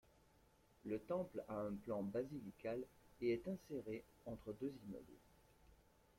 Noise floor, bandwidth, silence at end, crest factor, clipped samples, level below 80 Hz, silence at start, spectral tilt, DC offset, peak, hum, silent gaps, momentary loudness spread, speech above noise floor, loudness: -73 dBFS; 16.5 kHz; 0.35 s; 18 dB; under 0.1%; -72 dBFS; 0.85 s; -7.5 dB/octave; under 0.1%; -32 dBFS; none; none; 13 LU; 26 dB; -48 LUFS